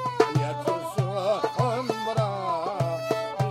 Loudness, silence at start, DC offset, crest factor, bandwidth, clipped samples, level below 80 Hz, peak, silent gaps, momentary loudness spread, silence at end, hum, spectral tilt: -27 LUFS; 0 s; under 0.1%; 22 dB; 14.5 kHz; under 0.1%; -64 dBFS; -6 dBFS; none; 4 LU; 0 s; none; -6.5 dB/octave